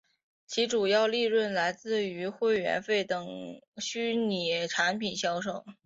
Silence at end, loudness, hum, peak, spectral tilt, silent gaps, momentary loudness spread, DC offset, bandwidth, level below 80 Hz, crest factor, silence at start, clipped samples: 0.15 s; -29 LUFS; none; -14 dBFS; -3.5 dB/octave; 3.68-3.72 s; 10 LU; under 0.1%; 7.8 kHz; -74 dBFS; 16 dB; 0.5 s; under 0.1%